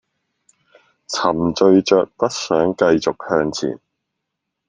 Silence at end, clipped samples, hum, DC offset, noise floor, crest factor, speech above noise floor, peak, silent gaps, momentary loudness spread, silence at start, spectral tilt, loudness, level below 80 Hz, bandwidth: 0.95 s; under 0.1%; none; under 0.1%; -78 dBFS; 18 dB; 62 dB; 0 dBFS; none; 11 LU; 1.1 s; -5 dB/octave; -18 LUFS; -54 dBFS; 9.8 kHz